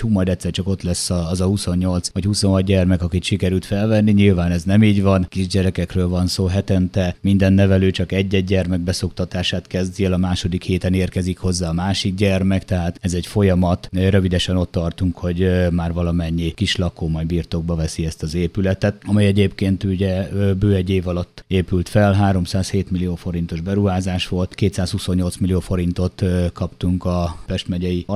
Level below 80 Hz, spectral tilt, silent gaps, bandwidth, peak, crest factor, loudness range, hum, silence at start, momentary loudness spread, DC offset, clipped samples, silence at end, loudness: -36 dBFS; -6.5 dB/octave; none; 12.5 kHz; -2 dBFS; 18 dB; 4 LU; none; 0 s; 7 LU; under 0.1%; under 0.1%; 0 s; -19 LUFS